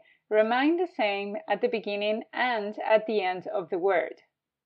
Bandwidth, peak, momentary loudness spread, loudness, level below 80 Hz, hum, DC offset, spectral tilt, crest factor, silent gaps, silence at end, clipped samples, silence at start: 5.6 kHz; -10 dBFS; 7 LU; -27 LUFS; -88 dBFS; none; under 0.1%; -7 dB/octave; 18 dB; none; 0.55 s; under 0.1%; 0.3 s